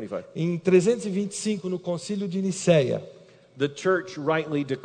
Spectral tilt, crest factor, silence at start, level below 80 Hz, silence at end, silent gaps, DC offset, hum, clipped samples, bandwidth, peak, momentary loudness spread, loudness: -5.5 dB/octave; 18 dB; 0 s; -70 dBFS; 0 s; none; under 0.1%; none; under 0.1%; 9.4 kHz; -6 dBFS; 9 LU; -25 LUFS